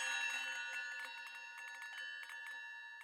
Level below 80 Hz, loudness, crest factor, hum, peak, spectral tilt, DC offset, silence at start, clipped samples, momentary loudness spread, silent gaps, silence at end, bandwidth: under -90 dBFS; -44 LUFS; 18 dB; none; -28 dBFS; 5.5 dB/octave; under 0.1%; 0 s; under 0.1%; 10 LU; none; 0 s; 16.5 kHz